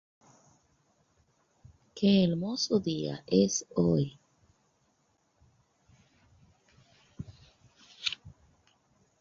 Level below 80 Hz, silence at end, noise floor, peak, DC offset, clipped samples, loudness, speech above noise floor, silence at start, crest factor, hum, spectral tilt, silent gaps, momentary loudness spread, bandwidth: -62 dBFS; 0.9 s; -73 dBFS; -12 dBFS; under 0.1%; under 0.1%; -29 LUFS; 45 dB; 1.95 s; 22 dB; none; -5.5 dB/octave; none; 22 LU; 7.6 kHz